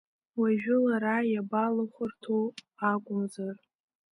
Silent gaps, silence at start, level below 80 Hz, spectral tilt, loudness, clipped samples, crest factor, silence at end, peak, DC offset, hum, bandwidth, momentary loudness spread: none; 0.35 s; -78 dBFS; -7.5 dB/octave; -30 LUFS; under 0.1%; 16 dB; 0.55 s; -14 dBFS; under 0.1%; none; 11.5 kHz; 12 LU